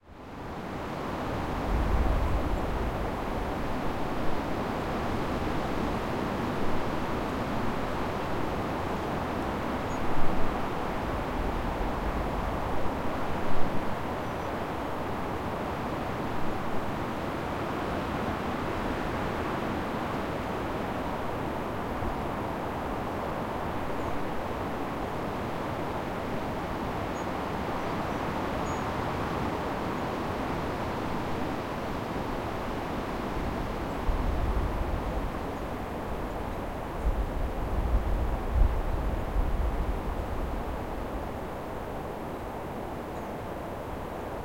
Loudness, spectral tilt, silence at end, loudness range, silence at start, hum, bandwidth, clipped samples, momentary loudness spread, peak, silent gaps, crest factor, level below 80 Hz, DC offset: -32 LUFS; -6.5 dB/octave; 0 s; 2 LU; 0.05 s; none; 16.5 kHz; under 0.1%; 4 LU; -10 dBFS; none; 20 dB; -36 dBFS; 0.2%